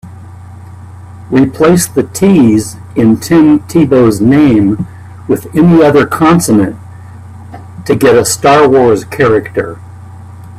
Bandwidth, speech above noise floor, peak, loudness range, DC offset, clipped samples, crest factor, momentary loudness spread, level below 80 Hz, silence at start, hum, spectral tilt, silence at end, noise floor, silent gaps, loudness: 15.5 kHz; 22 dB; 0 dBFS; 2 LU; under 0.1%; under 0.1%; 10 dB; 15 LU; -42 dBFS; 0.05 s; none; -6 dB/octave; 0 s; -29 dBFS; none; -8 LUFS